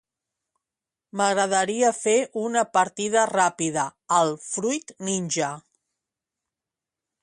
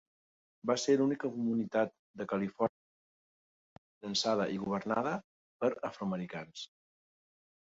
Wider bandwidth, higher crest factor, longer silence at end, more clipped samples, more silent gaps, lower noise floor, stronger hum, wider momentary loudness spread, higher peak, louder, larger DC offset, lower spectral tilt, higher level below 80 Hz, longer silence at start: first, 11.5 kHz vs 8 kHz; about the same, 18 dB vs 20 dB; first, 1.65 s vs 1 s; neither; second, none vs 1.99-2.14 s, 2.69-4.01 s, 5.24-5.60 s; about the same, -89 dBFS vs under -90 dBFS; neither; second, 8 LU vs 13 LU; first, -8 dBFS vs -16 dBFS; first, -23 LUFS vs -34 LUFS; neither; second, -3 dB/octave vs -5 dB/octave; about the same, -72 dBFS vs -74 dBFS; first, 1.15 s vs 0.65 s